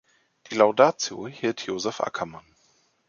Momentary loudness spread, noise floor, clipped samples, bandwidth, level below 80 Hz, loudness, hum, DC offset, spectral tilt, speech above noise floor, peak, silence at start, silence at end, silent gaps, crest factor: 14 LU; -65 dBFS; under 0.1%; 7.2 kHz; -68 dBFS; -24 LUFS; none; under 0.1%; -3.5 dB/octave; 41 dB; -4 dBFS; 0.5 s; 0.7 s; none; 22 dB